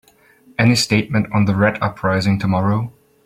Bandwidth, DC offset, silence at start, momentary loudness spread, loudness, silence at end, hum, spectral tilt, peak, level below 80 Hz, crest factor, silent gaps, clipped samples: 16 kHz; under 0.1%; 0.6 s; 7 LU; -17 LUFS; 0.35 s; none; -5.5 dB/octave; -2 dBFS; -48 dBFS; 16 dB; none; under 0.1%